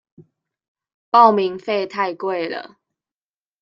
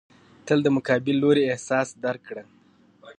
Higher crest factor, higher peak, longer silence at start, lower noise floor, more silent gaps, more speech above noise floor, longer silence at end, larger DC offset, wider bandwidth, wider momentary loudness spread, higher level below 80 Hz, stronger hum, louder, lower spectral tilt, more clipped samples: about the same, 20 dB vs 18 dB; first, -2 dBFS vs -6 dBFS; second, 0.2 s vs 0.45 s; first, under -90 dBFS vs -56 dBFS; first, 0.68-0.75 s, 0.94-1.12 s vs none; first, over 72 dB vs 33 dB; first, 0.95 s vs 0.05 s; neither; second, 7.4 kHz vs 9.8 kHz; second, 13 LU vs 18 LU; about the same, -72 dBFS vs -68 dBFS; neither; first, -18 LUFS vs -23 LUFS; about the same, -6.5 dB/octave vs -6 dB/octave; neither